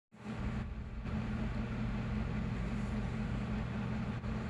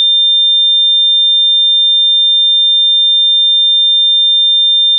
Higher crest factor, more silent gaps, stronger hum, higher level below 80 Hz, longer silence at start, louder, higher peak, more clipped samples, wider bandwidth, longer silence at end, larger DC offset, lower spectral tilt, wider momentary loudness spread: first, 12 dB vs 4 dB; neither; neither; first, -44 dBFS vs under -90 dBFS; first, 0.15 s vs 0 s; second, -39 LUFS vs -6 LUFS; second, -24 dBFS vs -6 dBFS; neither; first, 10 kHz vs 3.9 kHz; about the same, 0 s vs 0 s; neither; first, -8 dB/octave vs 14 dB/octave; first, 4 LU vs 0 LU